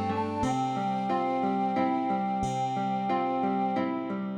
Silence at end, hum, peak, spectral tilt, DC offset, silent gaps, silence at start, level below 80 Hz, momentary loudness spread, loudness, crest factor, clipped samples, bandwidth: 0 s; none; -16 dBFS; -6.5 dB/octave; under 0.1%; none; 0 s; -58 dBFS; 2 LU; -29 LUFS; 14 dB; under 0.1%; 10.5 kHz